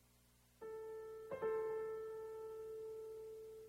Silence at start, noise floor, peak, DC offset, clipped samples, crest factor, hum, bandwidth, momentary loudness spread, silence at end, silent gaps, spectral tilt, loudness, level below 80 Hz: 0 s; -72 dBFS; -32 dBFS; under 0.1%; under 0.1%; 16 dB; 60 Hz at -75 dBFS; 16 kHz; 11 LU; 0 s; none; -5.5 dB/octave; -48 LUFS; -78 dBFS